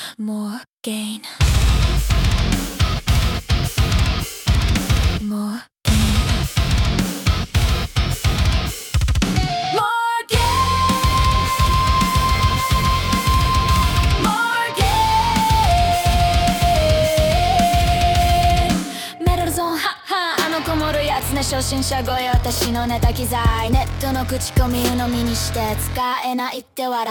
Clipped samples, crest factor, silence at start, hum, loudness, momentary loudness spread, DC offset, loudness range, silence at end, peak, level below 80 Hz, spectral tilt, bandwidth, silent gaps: under 0.1%; 14 dB; 0 s; none; -18 LUFS; 6 LU; under 0.1%; 4 LU; 0 s; -4 dBFS; -24 dBFS; -4.5 dB/octave; 18 kHz; 0.72-0.78 s